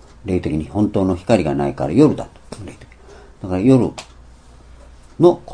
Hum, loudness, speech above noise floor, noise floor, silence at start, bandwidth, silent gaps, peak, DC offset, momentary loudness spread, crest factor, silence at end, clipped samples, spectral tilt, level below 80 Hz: none; -17 LUFS; 26 dB; -43 dBFS; 0.25 s; 10.5 kHz; none; 0 dBFS; under 0.1%; 21 LU; 18 dB; 0 s; under 0.1%; -8 dB/octave; -42 dBFS